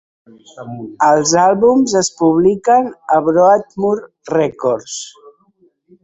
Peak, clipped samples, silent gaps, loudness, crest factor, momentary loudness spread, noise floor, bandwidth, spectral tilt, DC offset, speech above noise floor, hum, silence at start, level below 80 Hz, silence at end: -2 dBFS; under 0.1%; none; -14 LUFS; 14 dB; 17 LU; -56 dBFS; 8.4 kHz; -4.5 dB/octave; under 0.1%; 42 dB; none; 0.55 s; -56 dBFS; 0.95 s